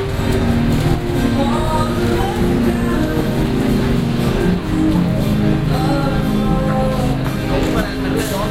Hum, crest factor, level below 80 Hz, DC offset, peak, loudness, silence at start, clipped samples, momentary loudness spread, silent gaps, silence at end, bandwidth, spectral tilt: none; 14 dB; -24 dBFS; under 0.1%; -2 dBFS; -17 LUFS; 0 s; under 0.1%; 2 LU; none; 0 s; 16.5 kHz; -7 dB/octave